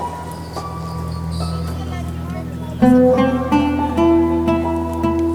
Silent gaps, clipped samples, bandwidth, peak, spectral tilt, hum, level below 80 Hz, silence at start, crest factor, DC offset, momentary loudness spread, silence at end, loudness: none; under 0.1%; 15 kHz; -2 dBFS; -7.5 dB/octave; none; -32 dBFS; 0 s; 14 dB; under 0.1%; 14 LU; 0 s; -18 LUFS